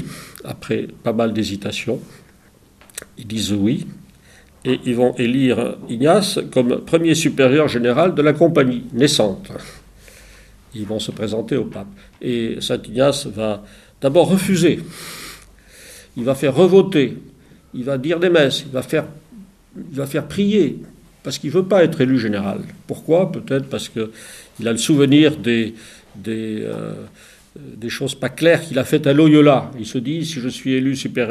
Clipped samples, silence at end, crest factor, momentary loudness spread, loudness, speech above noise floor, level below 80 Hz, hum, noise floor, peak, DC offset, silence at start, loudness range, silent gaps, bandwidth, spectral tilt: under 0.1%; 0 s; 18 dB; 18 LU; -18 LUFS; 33 dB; -52 dBFS; none; -50 dBFS; 0 dBFS; under 0.1%; 0 s; 7 LU; none; 15 kHz; -5.5 dB/octave